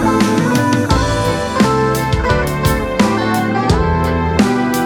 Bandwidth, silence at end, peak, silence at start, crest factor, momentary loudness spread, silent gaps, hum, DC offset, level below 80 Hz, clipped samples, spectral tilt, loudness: over 20 kHz; 0 s; -2 dBFS; 0 s; 12 dB; 3 LU; none; none; under 0.1%; -26 dBFS; under 0.1%; -5.5 dB/octave; -15 LUFS